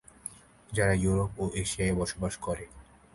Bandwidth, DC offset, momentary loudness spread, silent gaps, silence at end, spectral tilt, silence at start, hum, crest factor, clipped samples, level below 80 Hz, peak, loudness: 11.5 kHz; under 0.1%; 17 LU; none; 0.3 s; -5 dB/octave; 0.25 s; none; 18 dB; under 0.1%; -44 dBFS; -12 dBFS; -30 LUFS